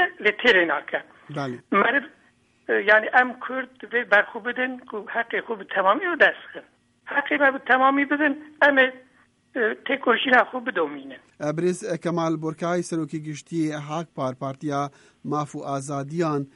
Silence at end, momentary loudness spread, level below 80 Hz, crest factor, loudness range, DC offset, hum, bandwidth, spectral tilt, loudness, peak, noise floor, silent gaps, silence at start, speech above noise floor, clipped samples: 0.1 s; 14 LU; -68 dBFS; 20 dB; 7 LU; under 0.1%; none; 11.5 kHz; -5 dB/octave; -23 LUFS; -4 dBFS; -61 dBFS; none; 0 s; 37 dB; under 0.1%